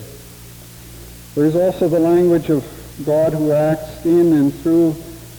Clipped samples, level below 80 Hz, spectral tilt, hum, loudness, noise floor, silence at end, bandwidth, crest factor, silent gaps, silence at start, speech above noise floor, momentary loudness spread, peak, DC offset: under 0.1%; -44 dBFS; -7.5 dB/octave; none; -16 LUFS; -38 dBFS; 0 s; over 20 kHz; 12 dB; none; 0 s; 23 dB; 23 LU; -6 dBFS; under 0.1%